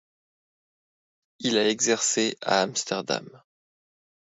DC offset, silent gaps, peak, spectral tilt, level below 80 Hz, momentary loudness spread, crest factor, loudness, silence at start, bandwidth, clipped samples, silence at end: under 0.1%; none; -8 dBFS; -2 dB/octave; -76 dBFS; 9 LU; 22 dB; -25 LUFS; 1.4 s; 8 kHz; under 0.1%; 0.95 s